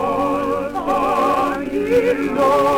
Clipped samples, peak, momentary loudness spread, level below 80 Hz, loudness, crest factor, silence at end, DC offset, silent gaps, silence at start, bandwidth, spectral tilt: under 0.1%; -6 dBFS; 5 LU; -44 dBFS; -18 LUFS; 12 dB; 0 s; under 0.1%; none; 0 s; 18.5 kHz; -5.5 dB/octave